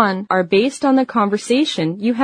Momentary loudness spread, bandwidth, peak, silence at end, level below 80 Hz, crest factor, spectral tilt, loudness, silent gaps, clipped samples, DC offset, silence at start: 4 LU; 10.5 kHz; 0 dBFS; 0 s; -60 dBFS; 16 dB; -5 dB/octave; -17 LUFS; none; under 0.1%; under 0.1%; 0 s